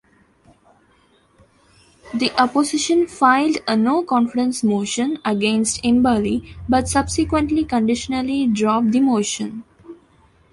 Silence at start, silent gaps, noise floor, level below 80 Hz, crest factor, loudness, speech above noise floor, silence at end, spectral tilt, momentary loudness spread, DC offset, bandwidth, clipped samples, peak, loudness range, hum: 2.05 s; none; -57 dBFS; -42 dBFS; 18 dB; -19 LUFS; 39 dB; 0.6 s; -4 dB/octave; 6 LU; under 0.1%; 11.5 kHz; under 0.1%; -2 dBFS; 2 LU; none